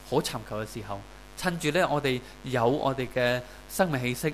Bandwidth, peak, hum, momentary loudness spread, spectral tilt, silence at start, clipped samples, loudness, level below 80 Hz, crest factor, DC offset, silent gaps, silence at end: 16 kHz; -10 dBFS; none; 12 LU; -5 dB/octave; 0 s; under 0.1%; -28 LUFS; -50 dBFS; 18 dB; 0.2%; none; 0 s